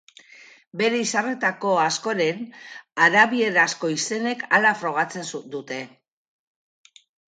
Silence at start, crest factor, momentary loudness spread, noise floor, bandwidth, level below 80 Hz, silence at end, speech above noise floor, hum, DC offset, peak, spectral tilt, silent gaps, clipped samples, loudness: 0.75 s; 20 dB; 16 LU; -50 dBFS; 9.6 kHz; -76 dBFS; 1.4 s; 27 dB; none; under 0.1%; -4 dBFS; -3 dB/octave; none; under 0.1%; -21 LUFS